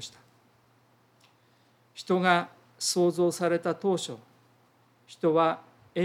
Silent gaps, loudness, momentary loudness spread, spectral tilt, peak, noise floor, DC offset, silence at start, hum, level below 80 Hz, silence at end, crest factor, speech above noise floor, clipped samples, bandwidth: none; -27 LUFS; 19 LU; -4.5 dB/octave; -8 dBFS; -64 dBFS; under 0.1%; 0 s; none; -82 dBFS; 0 s; 22 dB; 38 dB; under 0.1%; 15.5 kHz